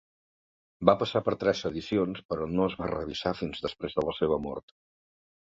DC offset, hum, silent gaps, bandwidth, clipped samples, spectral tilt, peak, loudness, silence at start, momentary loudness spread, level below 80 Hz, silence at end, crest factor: under 0.1%; none; 2.25-2.29 s; 7.6 kHz; under 0.1%; -6.5 dB/octave; -6 dBFS; -29 LUFS; 0.8 s; 9 LU; -54 dBFS; 1 s; 26 dB